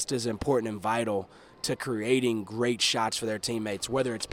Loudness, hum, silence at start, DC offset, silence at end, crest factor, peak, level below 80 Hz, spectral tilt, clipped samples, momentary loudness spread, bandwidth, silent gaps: -29 LUFS; none; 0 s; under 0.1%; 0 s; 18 dB; -12 dBFS; -58 dBFS; -3.5 dB/octave; under 0.1%; 7 LU; 16.5 kHz; none